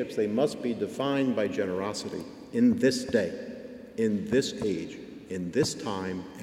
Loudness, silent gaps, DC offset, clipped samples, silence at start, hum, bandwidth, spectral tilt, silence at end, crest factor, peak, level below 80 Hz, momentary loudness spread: -29 LUFS; none; under 0.1%; under 0.1%; 0 s; none; 15.5 kHz; -5 dB/octave; 0 s; 16 dB; -12 dBFS; -62 dBFS; 14 LU